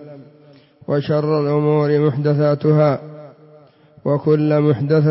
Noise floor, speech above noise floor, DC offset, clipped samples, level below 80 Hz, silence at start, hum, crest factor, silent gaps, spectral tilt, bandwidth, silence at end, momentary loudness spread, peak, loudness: -48 dBFS; 32 dB; under 0.1%; under 0.1%; -60 dBFS; 0 s; none; 14 dB; none; -13 dB/octave; 5.8 kHz; 0 s; 9 LU; -4 dBFS; -17 LUFS